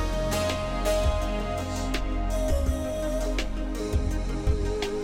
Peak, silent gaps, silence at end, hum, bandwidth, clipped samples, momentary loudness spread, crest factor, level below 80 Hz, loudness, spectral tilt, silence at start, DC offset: -14 dBFS; none; 0 s; none; 16.5 kHz; under 0.1%; 4 LU; 14 dB; -30 dBFS; -29 LUFS; -5.5 dB/octave; 0 s; under 0.1%